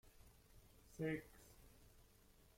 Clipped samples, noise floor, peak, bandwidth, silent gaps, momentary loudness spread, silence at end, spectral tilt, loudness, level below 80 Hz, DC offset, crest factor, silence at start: under 0.1%; -70 dBFS; -32 dBFS; 16.5 kHz; none; 23 LU; 0.55 s; -6.5 dB/octave; -47 LUFS; -70 dBFS; under 0.1%; 22 dB; 0.05 s